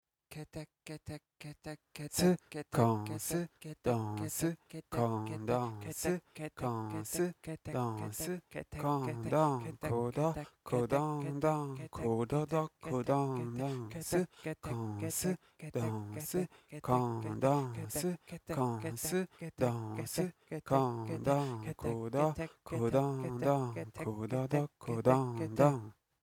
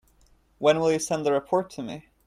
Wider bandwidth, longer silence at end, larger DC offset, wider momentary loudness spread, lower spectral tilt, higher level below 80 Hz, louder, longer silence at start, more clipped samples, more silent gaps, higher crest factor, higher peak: first, 18.5 kHz vs 14.5 kHz; about the same, 0.3 s vs 0.25 s; neither; about the same, 13 LU vs 14 LU; first, -6 dB/octave vs -4.5 dB/octave; about the same, -62 dBFS vs -62 dBFS; second, -36 LUFS vs -25 LUFS; second, 0.3 s vs 0.6 s; neither; neither; about the same, 22 dB vs 18 dB; second, -14 dBFS vs -8 dBFS